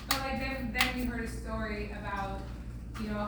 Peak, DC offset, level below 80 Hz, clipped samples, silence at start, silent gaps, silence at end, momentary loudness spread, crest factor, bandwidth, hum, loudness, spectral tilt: -10 dBFS; under 0.1%; -42 dBFS; under 0.1%; 0 s; none; 0 s; 12 LU; 24 dB; over 20 kHz; none; -34 LUFS; -4 dB/octave